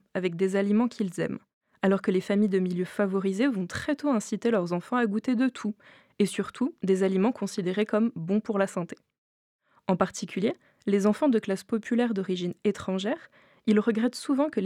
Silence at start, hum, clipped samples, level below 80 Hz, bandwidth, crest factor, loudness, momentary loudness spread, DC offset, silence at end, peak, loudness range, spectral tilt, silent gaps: 0.15 s; none; under 0.1%; -70 dBFS; 13 kHz; 20 dB; -27 LUFS; 8 LU; under 0.1%; 0 s; -8 dBFS; 2 LU; -6.5 dB/octave; 1.53-1.61 s, 9.18-9.59 s